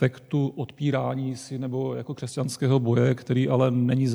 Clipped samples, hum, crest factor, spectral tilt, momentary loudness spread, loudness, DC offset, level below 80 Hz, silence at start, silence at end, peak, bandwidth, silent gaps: under 0.1%; none; 16 dB; -7.5 dB/octave; 9 LU; -25 LUFS; under 0.1%; -70 dBFS; 0 s; 0 s; -8 dBFS; 12 kHz; none